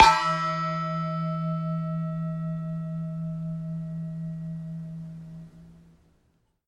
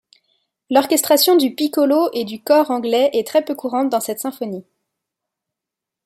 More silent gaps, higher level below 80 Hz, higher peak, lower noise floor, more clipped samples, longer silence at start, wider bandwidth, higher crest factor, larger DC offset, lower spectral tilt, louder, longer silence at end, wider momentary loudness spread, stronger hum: neither; first, -52 dBFS vs -72 dBFS; about the same, -2 dBFS vs -2 dBFS; second, -68 dBFS vs -85 dBFS; neither; second, 0 s vs 0.7 s; second, 11.5 kHz vs 16.5 kHz; first, 26 dB vs 18 dB; neither; first, -5.5 dB/octave vs -3 dB/octave; second, -29 LUFS vs -17 LUFS; second, 0.9 s vs 1.45 s; about the same, 13 LU vs 12 LU; neither